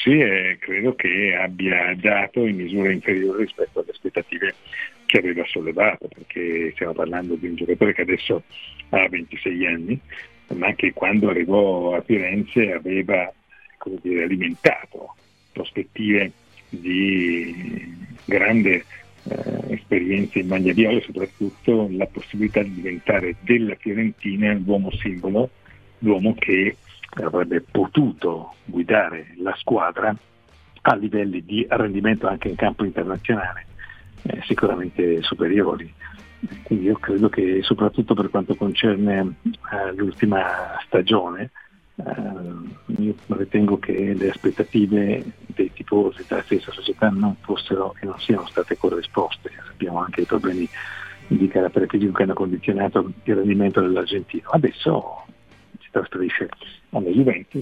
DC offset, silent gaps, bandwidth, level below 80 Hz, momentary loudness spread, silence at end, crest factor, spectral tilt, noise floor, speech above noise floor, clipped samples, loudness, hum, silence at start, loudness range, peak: 0.1%; none; 8 kHz; -50 dBFS; 13 LU; 0 s; 22 dB; -7.5 dB/octave; -51 dBFS; 30 dB; under 0.1%; -21 LUFS; none; 0 s; 3 LU; 0 dBFS